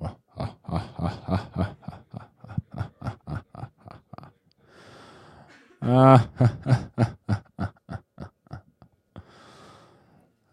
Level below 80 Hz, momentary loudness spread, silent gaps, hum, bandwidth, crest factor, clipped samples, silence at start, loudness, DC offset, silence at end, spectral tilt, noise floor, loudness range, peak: -50 dBFS; 27 LU; none; none; 10 kHz; 24 dB; under 0.1%; 0 s; -25 LUFS; under 0.1%; 1.3 s; -8.5 dB/octave; -61 dBFS; 16 LU; -2 dBFS